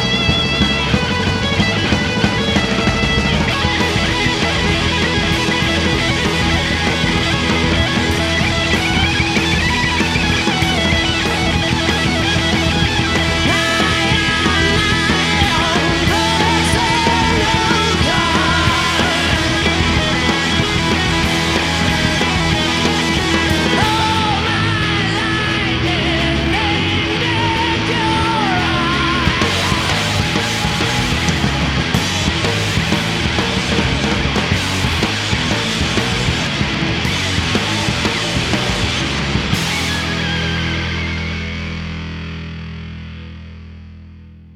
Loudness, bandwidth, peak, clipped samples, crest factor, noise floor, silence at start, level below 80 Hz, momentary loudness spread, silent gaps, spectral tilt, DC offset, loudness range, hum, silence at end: -15 LUFS; 15.5 kHz; 0 dBFS; under 0.1%; 16 dB; -38 dBFS; 0 s; -28 dBFS; 4 LU; none; -4 dB/octave; under 0.1%; 3 LU; none; 0.05 s